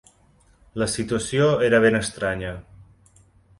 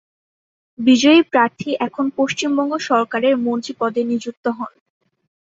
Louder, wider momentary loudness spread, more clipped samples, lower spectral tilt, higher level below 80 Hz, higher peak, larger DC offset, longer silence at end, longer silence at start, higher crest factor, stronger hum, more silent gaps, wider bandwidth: second, -21 LUFS vs -18 LUFS; first, 16 LU vs 12 LU; neither; about the same, -5 dB/octave vs -4 dB/octave; first, -48 dBFS vs -66 dBFS; about the same, -4 dBFS vs -2 dBFS; neither; second, 0.75 s vs 0.9 s; about the same, 0.75 s vs 0.8 s; about the same, 18 dB vs 18 dB; neither; second, none vs 4.37-4.43 s; first, 11.5 kHz vs 7.8 kHz